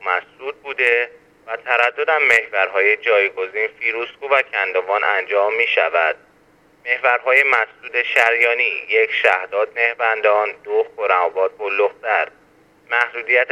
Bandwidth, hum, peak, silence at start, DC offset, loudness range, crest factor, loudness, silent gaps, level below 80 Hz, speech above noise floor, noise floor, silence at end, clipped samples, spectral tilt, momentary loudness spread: 12.5 kHz; none; 0 dBFS; 0 s; under 0.1%; 3 LU; 18 dB; -17 LUFS; none; -68 dBFS; 36 dB; -54 dBFS; 0 s; under 0.1%; -1.5 dB/octave; 8 LU